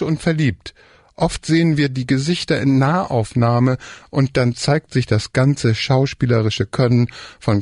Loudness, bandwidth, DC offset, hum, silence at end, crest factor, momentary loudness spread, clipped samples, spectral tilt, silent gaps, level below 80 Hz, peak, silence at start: -18 LUFS; 11 kHz; under 0.1%; none; 0 s; 12 dB; 6 LU; under 0.1%; -6.5 dB/octave; none; -44 dBFS; -6 dBFS; 0 s